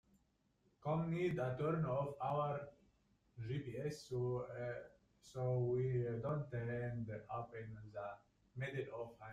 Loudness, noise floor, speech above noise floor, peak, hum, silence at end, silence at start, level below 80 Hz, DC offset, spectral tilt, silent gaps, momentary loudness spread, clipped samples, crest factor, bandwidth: -43 LUFS; -79 dBFS; 37 dB; -28 dBFS; none; 0 s; 0.8 s; -70 dBFS; under 0.1%; -8 dB/octave; none; 13 LU; under 0.1%; 16 dB; 11 kHz